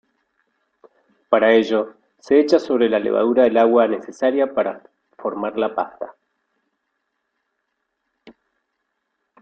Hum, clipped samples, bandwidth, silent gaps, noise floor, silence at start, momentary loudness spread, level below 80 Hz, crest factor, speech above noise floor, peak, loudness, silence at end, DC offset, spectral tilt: none; under 0.1%; 7.6 kHz; none; -75 dBFS; 1.3 s; 14 LU; -66 dBFS; 20 dB; 58 dB; -2 dBFS; -18 LUFS; 1.1 s; under 0.1%; -5.5 dB/octave